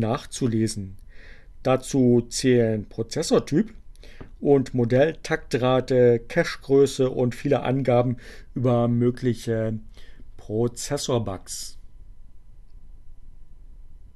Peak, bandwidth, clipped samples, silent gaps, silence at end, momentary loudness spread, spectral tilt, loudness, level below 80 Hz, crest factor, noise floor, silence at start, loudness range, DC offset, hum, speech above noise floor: -6 dBFS; 13 kHz; under 0.1%; none; 0.05 s; 12 LU; -6 dB/octave; -23 LUFS; -44 dBFS; 18 dB; -42 dBFS; 0 s; 9 LU; under 0.1%; none; 20 dB